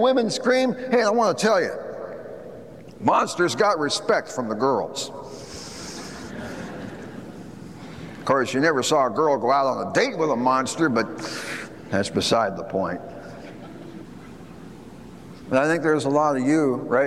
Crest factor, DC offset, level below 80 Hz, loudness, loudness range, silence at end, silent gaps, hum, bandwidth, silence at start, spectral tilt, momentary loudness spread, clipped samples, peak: 18 dB; 0.2%; -58 dBFS; -22 LUFS; 8 LU; 0 s; none; none; 14 kHz; 0 s; -4.5 dB/octave; 20 LU; under 0.1%; -6 dBFS